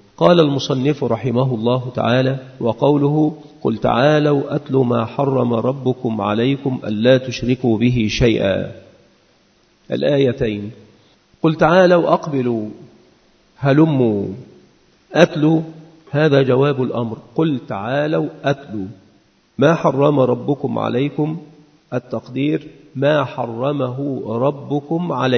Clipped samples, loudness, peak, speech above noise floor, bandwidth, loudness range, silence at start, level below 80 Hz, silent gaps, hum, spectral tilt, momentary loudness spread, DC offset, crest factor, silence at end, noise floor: under 0.1%; -17 LUFS; 0 dBFS; 40 dB; 6.6 kHz; 4 LU; 0.2 s; -46 dBFS; none; none; -7.5 dB/octave; 10 LU; under 0.1%; 18 dB; 0 s; -56 dBFS